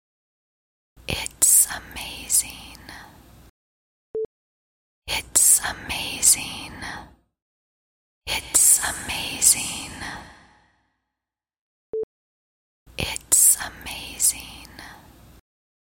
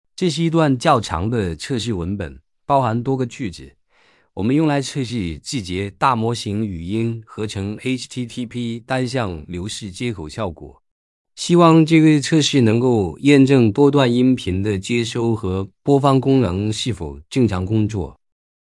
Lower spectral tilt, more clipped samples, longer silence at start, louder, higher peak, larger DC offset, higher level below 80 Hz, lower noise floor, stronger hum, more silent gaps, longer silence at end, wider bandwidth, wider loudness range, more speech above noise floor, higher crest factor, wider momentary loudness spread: second, 0 dB/octave vs -6 dB/octave; neither; first, 1.1 s vs 0.2 s; about the same, -18 LUFS vs -19 LUFS; about the same, 0 dBFS vs -2 dBFS; neither; about the same, -50 dBFS vs -48 dBFS; first, -88 dBFS vs -57 dBFS; neither; first, 3.50-4.14 s, 4.25-5.02 s, 7.42-8.21 s, 11.58-11.93 s, 12.03-12.86 s vs 10.91-11.25 s; first, 0.9 s vs 0.5 s; first, 16.5 kHz vs 12 kHz; about the same, 8 LU vs 10 LU; first, 63 dB vs 39 dB; first, 26 dB vs 18 dB; first, 25 LU vs 14 LU